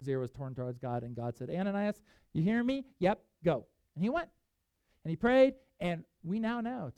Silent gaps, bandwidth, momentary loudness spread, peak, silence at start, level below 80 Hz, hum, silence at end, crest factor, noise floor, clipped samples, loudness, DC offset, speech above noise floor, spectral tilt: none; 10 kHz; 12 LU; -14 dBFS; 0 s; -62 dBFS; none; 0.05 s; 20 dB; -81 dBFS; under 0.1%; -34 LUFS; under 0.1%; 48 dB; -8 dB/octave